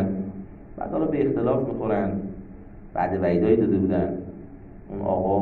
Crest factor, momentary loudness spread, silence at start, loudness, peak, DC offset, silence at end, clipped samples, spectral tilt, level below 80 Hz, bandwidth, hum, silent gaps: 18 dB; 21 LU; 0 s; -24 LUFS; -6 dBFS; under 0.1%; 0 s; under 0.1%; -11.5 dB/octave; -46 dBFS; 4.5 kHz; none; none